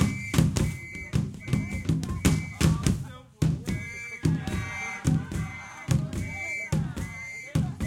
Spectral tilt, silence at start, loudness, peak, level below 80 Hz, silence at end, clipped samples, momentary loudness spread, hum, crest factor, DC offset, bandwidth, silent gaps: -5.5 dB/octave; 0 s; -29 LUFS; -6 dBFS; -40 dBFS; 0 s; under 0.1%; 10 LU; none; 22 dB; under 0.1%; 16.5 kHz; none